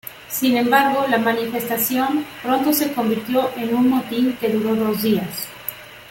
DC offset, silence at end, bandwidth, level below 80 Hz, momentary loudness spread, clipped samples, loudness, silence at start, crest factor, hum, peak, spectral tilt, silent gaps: under 0.1%; 0 s; 17 kHz; -58 dBFS; 11 LU; under 0.1%; -19 LUFS; 0.05 s; 16 dB; none; -2 dBFS; -4 dB/octave; none